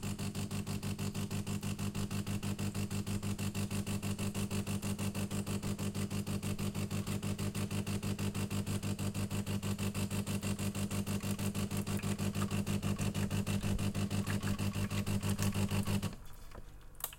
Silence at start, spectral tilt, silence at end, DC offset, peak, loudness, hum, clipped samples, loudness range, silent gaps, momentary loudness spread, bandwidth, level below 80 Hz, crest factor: 0 s; -5.5 dB/octave; 0 s; under 0.1%; -18 dBFS; -37 LUFS; 50 Hz at -40 dBFS; under 0.1%; 2 LU; none; 4 LU; 17 kHz; -52 dBFS; 20 dB